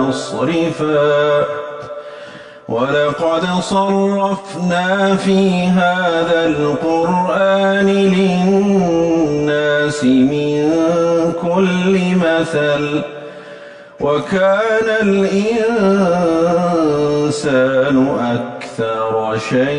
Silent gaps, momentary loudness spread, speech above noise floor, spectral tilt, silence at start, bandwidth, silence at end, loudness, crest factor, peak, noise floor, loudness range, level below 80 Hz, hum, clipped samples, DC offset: none; 9 LU; 21 dB; -6 dB/octave; 0 s; 10.5 kHz; 0 s; -15 LUFS; 12 dB; -4 dBFS; -35 dBFS; 3 LU; -48 dBFS; none; under 0.1%; under 0.1%